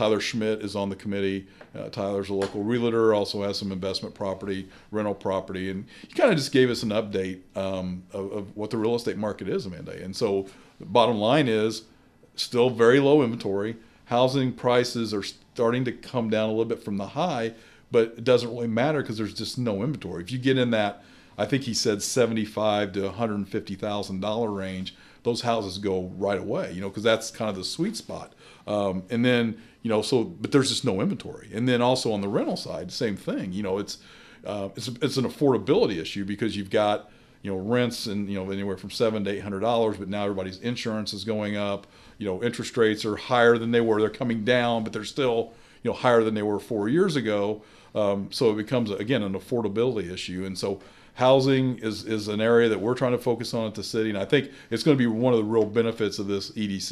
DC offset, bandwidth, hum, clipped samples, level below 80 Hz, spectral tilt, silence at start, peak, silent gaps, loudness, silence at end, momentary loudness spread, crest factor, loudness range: under 0.1%; 14 kHz; none; under 0.1%; -60 dBFS; -5.5 dB/octave; 0 s; -4 dBFS; none; -26 LUFS; 0 s; 11 LU; 22 dB; 5 LU